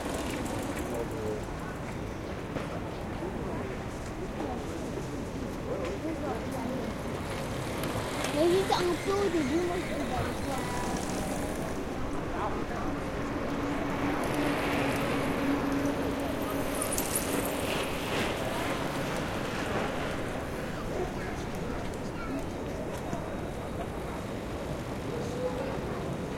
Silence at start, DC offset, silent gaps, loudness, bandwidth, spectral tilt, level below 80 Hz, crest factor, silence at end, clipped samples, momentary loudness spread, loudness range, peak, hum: 0 s; under 0.1%; none; -33 LUFS; 16.5 kHz; -5 dB/octave; -44 dBFS; 18 dB; 0 s; under 0.1%; 8 LU; 6 LU; -14 dBFS; none